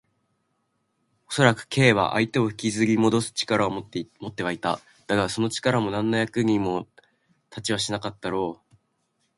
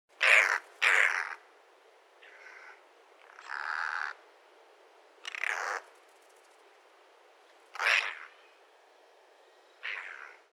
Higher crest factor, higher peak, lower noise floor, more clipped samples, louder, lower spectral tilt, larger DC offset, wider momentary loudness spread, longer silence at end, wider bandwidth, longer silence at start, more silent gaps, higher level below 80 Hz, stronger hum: about the same, 22 dB vs 26 dB; first, -2 dBFS vs -8 dBFS; first, -73 dBFS vs -61 dBFS; neither; first, -24 LUFS vs -29 LUFS; first, -5 dB/octave vs 4 dB/octave; neither; second, 12 LU vs 27 LU; first, 0.85 s vs 0.2 s; second, 11.5 kHz vs 17 kHz; first, 1.3 s vs 0.2 s; neither; first, -58 dBFS vs under -90 dBFS; neither